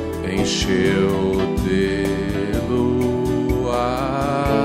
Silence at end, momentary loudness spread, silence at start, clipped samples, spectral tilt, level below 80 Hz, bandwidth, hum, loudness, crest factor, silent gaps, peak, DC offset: 0 s; 4 LU; 0 s; under 0.1%; -6 dB/octave; -32 dBFS; 16 kHz; none; -20 LUFS; 14 dB; none; -4 dBFS; under 0.1%